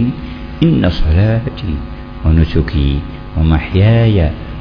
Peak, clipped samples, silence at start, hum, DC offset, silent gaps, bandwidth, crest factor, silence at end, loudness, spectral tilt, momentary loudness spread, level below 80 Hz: 0 dBFS; 0.1%; 0 s; none; under 0.1%; none; 5.4 kHz; 12 dB; 0 s; -14 LUFS; -9.5 dB/octave; 12 LU; -20 dBFS